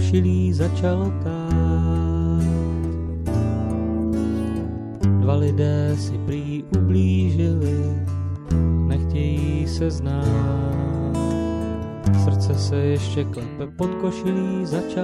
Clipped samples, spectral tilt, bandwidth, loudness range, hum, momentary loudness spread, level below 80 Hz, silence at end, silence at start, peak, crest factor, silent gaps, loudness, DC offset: under 0.1%; -8 dB/octave; 11 kHz; 2 LU; none; 7 LU; -32 dBFS; 0 s; 0 s; -6 dBFS; 14 dB; none; -22 LUFS; under 0.1%